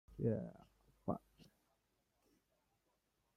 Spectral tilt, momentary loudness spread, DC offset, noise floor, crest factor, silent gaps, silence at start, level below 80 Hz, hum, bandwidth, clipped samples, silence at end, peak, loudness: -10 dB/octave; 9 LU; under 0.1%; -83 dBFS; 22 dB; none; 0.1 s; -70 dBFS; none; 13 kHz; under 0.1%; 1.95 s; -26 dBFS; -45 LUFS